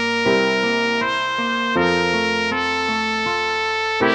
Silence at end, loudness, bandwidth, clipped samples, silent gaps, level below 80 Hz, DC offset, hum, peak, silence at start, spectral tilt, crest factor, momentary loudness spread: 0 s; -19 LUFS; 10.5 kHz; under 0.1%; none; -52 dBFS; under 0.1%; none; -4 dBFS; 0 s; -4 dB/octave; 16 dB; 3 LU